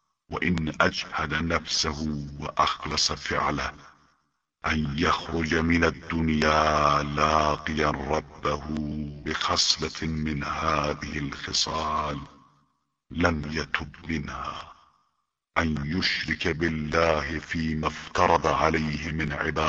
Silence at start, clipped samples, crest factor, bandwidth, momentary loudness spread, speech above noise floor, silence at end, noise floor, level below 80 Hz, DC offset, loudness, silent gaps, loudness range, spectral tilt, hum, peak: 0.3 s; under 0.1%; 22 dB; 8.2 kHz; 10 LU; 50 dB; 0 s; -77 dBFS; -44 dBFS; under 0.1%; -26 LUFS; none; 6 LU; -4 dB/octave; none; -4 dBFS